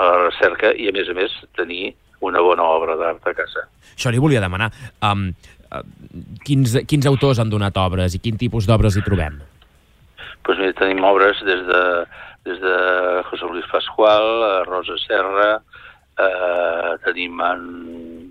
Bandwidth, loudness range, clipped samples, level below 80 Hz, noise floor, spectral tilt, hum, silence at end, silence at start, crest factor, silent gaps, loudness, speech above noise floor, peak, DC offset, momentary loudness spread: 15.5 kHz; 3 LU; under 0.1%; -40 dBFS; -52 dBFS; -6 dB/octave; none; 0 s; 0 s; 16 dB; none; -18 LUFS; 34 dB; -2 dBFS; under 0.1%; 17 LU